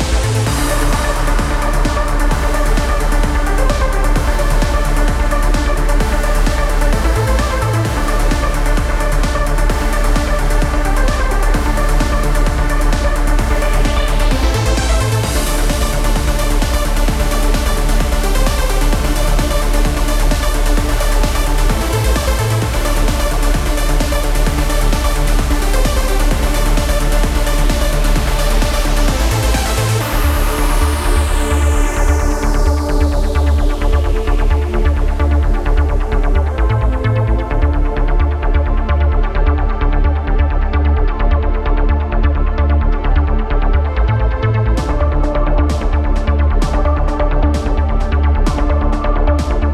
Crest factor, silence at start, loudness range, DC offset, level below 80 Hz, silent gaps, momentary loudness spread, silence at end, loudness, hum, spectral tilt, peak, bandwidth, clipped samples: 10 dB; 0 s; 1 LU; under 0.1%; -14 dBFS; none; 2 LU; 0 s; -16 LUFS; none; -5 dB/octave; -2 dBFS; 15 kHz; under 0.1%